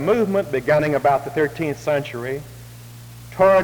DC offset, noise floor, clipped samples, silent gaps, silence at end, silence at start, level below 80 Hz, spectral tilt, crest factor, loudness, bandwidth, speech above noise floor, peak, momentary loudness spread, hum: under 0.1%; -39 dBFS; under 0.1%; none; 0 s; 0 s; -50 dBFS; -6.5 dB/octave; 16 dB; -20 LUFS; over 20 kHz; 19 dB; -4 dBFS; 22 LU; none